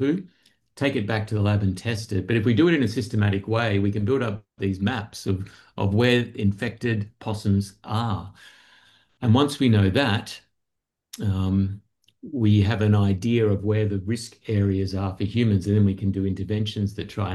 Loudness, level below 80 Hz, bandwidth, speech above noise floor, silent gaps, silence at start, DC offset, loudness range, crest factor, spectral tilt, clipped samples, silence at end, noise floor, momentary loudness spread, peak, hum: -24 LUFS; -58 dBFS; 12 kHz; 59 dB; none; 0 s; under 0.1%; 2 LU; 18 dB; -7 dB/octave; under 0.1%; 0 s; -82 dBFS; 10 LU; -6 dBFS; none